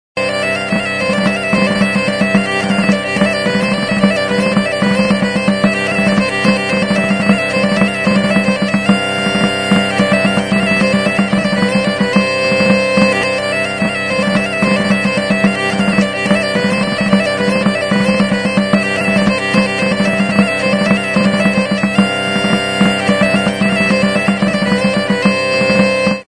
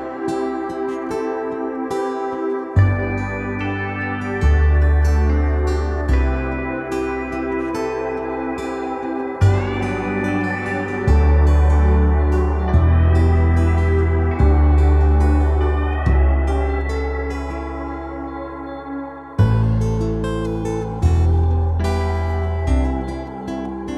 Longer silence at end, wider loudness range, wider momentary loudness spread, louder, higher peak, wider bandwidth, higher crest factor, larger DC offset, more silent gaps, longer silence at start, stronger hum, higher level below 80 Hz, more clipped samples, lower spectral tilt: about the same, 0.05 s vs 0 s; second, 1 LU vs 6 LU; second, 2 LU vs 11 LU; first, -13 LUFS vs -19 LUFS; first, 0 dBFS vs -4 dBFS; first, 10.5 kHz vs 8 kHz; about the same, 14 dB vs 14 dB; neither; neither; first, 0.15 s vs 0 s; neither; second, -44 dBFS vs -20 dBFS; neither; second, -5.5 dB/octave vs -8.5 dB/octave